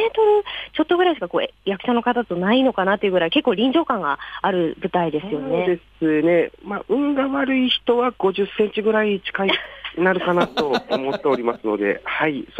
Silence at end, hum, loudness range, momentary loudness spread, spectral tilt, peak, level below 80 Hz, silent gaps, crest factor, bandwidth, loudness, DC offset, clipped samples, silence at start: 0 s; none; 2 LU; 6 LU; -7 dB/octave; -4 dBFS; -54 dBFS; none; 16 dB; 8.8 kHz; -20 LUFS; under 0.1%; under 0.1%; 0 s